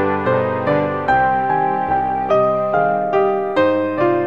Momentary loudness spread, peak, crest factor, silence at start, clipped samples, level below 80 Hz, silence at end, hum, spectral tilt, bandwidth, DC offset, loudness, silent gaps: 2 LU; -4 dBFS; 12 dB; 0 s; under 0.1%; -48 dBFS; 0 s; none; -8.5 dB/octave; 6.8 kHz; 0.6%; -17 LUFS; none